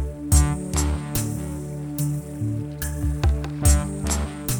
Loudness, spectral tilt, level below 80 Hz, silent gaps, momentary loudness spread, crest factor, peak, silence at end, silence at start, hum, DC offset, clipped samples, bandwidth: -24 LUFS; -5 dB/octave; -26 dBFS; none; 9 LU; 18 dB; -4 dBFS; 0 s; 0 s; none; under 0.1%; under 0.1%; over 20 kHz